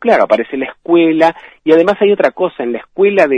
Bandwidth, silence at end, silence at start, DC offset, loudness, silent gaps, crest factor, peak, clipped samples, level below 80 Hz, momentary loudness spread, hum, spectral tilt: 9.2 kHz; 0 s; 0 s; under 0.1%; -13 LUFS; none; 12 dB; 0 dBFS; 0.3%; -58 dBFS; 10 LU; none; -6.5 dB/octave